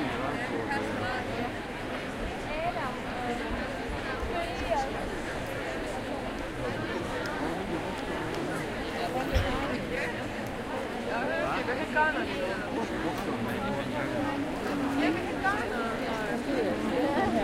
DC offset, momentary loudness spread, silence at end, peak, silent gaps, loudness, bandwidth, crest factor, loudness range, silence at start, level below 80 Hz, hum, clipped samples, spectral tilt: under 0.1%; 6 LU; 0 s; -12 dBFS; none; -31 LUFS; 16 kHz; 18 dB; 3 LU; 0 s; -44 dBFS; none; under 0.1%; -5.5 dB/octave